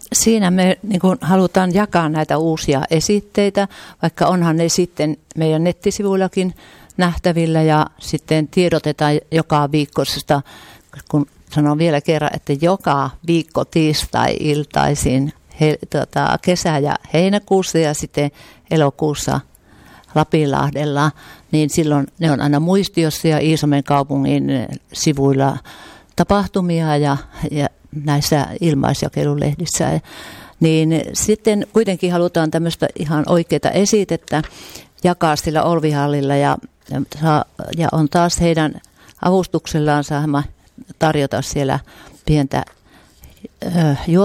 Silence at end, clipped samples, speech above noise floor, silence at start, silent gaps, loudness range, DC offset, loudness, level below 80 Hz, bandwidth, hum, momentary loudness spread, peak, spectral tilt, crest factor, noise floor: 0 s; under 0.1%; 29 dB; 0.05 s; none; 2 LU; under 0.1%; -17 LUFS; -42 dBFS; 16 kHz; none; 7 LU; -2 dBFS; -5.5 dB/octave; 14 dB; -45 dBFS